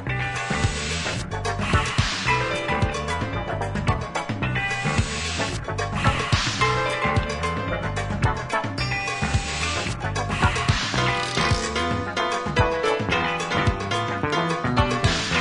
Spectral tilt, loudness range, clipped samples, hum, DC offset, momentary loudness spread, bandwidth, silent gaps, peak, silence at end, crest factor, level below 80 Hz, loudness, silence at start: -4.5 dB/octave; 2 LU; under 0.1%; none; under 0.1%; 5 LU; 11 kHz; none; -4 dBFS; 0 s; 20 dB; -36 dBFS; -24 LUFS; 0 s